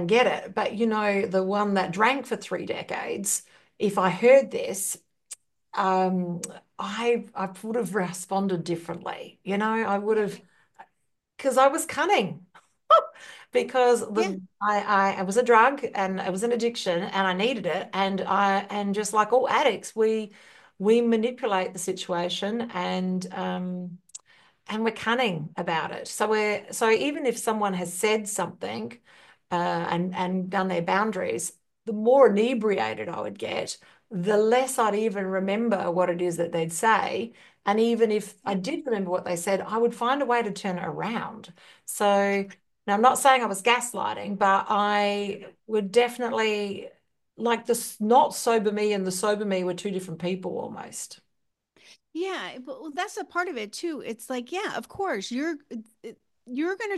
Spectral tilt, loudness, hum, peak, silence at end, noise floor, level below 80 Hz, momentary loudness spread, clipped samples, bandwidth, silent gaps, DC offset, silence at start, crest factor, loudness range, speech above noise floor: -4 dB/octave; -25 LUFS; none; -4 dBFS; 0 s; -78 dBFS; -74 dBFS; 14 LU; under 0.1%; 12.5 kHz; none; under 0.1%; 0 s; 22 dB; 7 LU; 53 dB